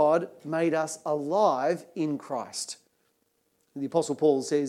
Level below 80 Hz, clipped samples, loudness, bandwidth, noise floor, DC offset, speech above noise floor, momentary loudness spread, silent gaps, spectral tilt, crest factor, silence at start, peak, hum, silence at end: -86 dBFS; under 0.1%; -28 LUFS; 14 kHz; -72 dBFS; under 0.1%; 45 dB; 11 LU; none; -5 dB/octave; 18 dB; 0 s; -10 dBFS; none; 0 s